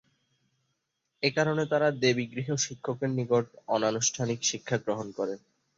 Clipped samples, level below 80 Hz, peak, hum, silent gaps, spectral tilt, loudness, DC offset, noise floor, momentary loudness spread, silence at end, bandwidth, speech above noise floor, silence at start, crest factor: under 0.1%; -70 dBFS; -10 dBFS; none; none; -4 dB/octave; -29 LUFS; under 0.1%; -80 dBFS; 7 LU; 0.4 s; 8 kHz; 51 dB; 1.2 s; 20 dB